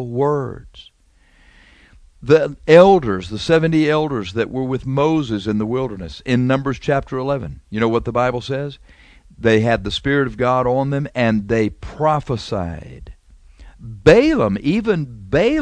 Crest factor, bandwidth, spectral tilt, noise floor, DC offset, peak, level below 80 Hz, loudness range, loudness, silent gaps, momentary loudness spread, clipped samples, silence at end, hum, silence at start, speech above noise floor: 18 dB; 9.6 kHz; -7 dB/octave; -53 dBFS; under 0.1%; 0 dBFS; -40 dBFS; 5 LU; -17 LUFS; none; 13 LU; under 0.1%; 0 s; none; 0 s; 36 dB